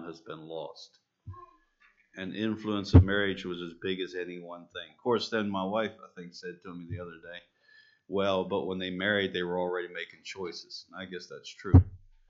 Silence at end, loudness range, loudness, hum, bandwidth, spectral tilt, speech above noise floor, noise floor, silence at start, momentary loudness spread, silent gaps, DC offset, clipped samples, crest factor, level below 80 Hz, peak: 0.3 s; 6 LU; -30 LUFS; none; 7.4 kHz; -5.5 dB/octave; 36 dB; -66 dBFS; 0 s; 22 LU; none; under 0.1%; under 0.1%; 24 dB; -46 dBFS; -6 dBFS